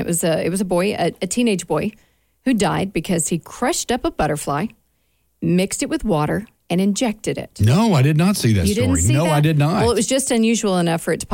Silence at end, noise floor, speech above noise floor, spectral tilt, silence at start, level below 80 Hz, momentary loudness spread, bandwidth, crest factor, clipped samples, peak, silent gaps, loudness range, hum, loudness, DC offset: 0 s; -65 dBFS; 47 dB; -5 dB/octave; 0 s; -40 dBFS; 7 LU; 17 kHz; 12 dB; under 0.1%; -6 dBFS; none; 5 LU; none; -19 LUFS; under 0.1%